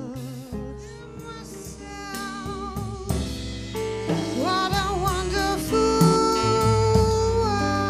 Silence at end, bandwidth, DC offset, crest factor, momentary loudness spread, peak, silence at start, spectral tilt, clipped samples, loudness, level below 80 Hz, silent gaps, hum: 0 s; 15.5 kHz; under 0.1%; 20 dB; 18 LU; -4 dBFS; 0 s; -5.5 dB/octave; under 0.1%; -23 LUFS; -36 dBFS; none; none